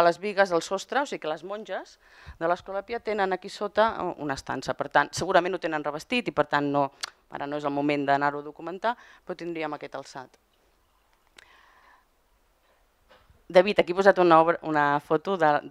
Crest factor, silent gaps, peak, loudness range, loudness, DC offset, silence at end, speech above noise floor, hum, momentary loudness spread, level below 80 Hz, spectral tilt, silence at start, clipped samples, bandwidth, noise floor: 24 dB; none; -4 dBFS; 13 LU; -26 LUFS; under 0.1%; 0 s; 40 dB; none; 16 LU; -62 dBFS; -5 dB/octave; 0 s; under 0.1%; 13 kHz; -66 dBFS